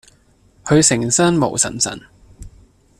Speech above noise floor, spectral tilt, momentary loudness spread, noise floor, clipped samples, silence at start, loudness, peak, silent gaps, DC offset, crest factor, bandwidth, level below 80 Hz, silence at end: 38 dB; -3.5 dB/octave; 13 LU; -54 dBFS; under 0.1%; 0.65 s; -15 LUFS; 0 dBFS; none; under 0.1%; 20 dB; 14 kHz; -46 dBFS; 0.5 s